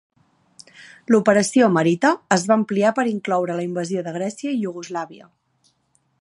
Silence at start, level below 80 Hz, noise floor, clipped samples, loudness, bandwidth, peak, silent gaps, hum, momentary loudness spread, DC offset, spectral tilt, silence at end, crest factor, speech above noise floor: 0.8 s; -70 dBFS; -66 dBFS; under 0.1%; -20 LUFS; 11.5 kHz; -2 dBFS; none; none; 13 LU; under 0.1%; -5.5 dB/octave; 1.05 s; 20 dB; 46 dB